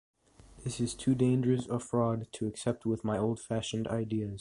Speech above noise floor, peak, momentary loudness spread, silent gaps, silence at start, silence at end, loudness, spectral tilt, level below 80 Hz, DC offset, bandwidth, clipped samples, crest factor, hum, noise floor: 25 dB; -16 dBFS; 8 LU; none; 0.55 s; 0 s; -32 LUFS; -6.5 dB/octave; -58 dBFS; under 0.1%; 11.5 kHz; under 0.1%; 16 dB; none; -56 dBFS